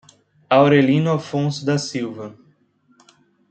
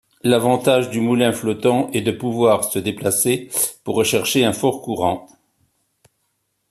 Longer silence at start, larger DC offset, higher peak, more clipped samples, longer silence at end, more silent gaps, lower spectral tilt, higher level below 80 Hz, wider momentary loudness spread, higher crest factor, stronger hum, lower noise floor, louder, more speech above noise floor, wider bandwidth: first, 0.5 s vs 0.25 s; neither; about the same, -2 dBFS vs -2 dBFS; neither; second, 1.2 s vs 1.5 s; neither; first, -6.5 dB/octave vs -4 dB/octave; about the same, -62 dBFS vs -58 dBFS; first, 16 LU vs 5 LU; about the same, 18 dB vs 18 dB; neither; second, -59 dBFS vs -70 dBFS; about the same, -18 LUFS vs -18 LUFS; second, 42 dB vs 52 dB; second, 8.8 kHz vs 14.5 kHz